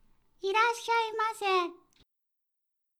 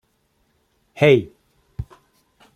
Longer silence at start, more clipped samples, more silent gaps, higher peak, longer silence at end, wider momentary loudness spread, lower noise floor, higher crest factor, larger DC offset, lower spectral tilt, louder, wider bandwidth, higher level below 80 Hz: second, 0.45 s vs 0.95 s; neither; neither; second, -14 dBFS vs -2 dBFS; first, 1.25 s vs 0.7 s; second, 8 LU vs 24 LU; first, -83 dBFS vs -66 dBFS; about the same, 20 dB vs 22 dB; neither; second, -0.5 dB/octave vs -7 dB/octave; second, -29 LUFS vs -17 LUFS; first, 19.5 kHz vs 12.5 kHz; second, -74 dBFS vs -48 dBFS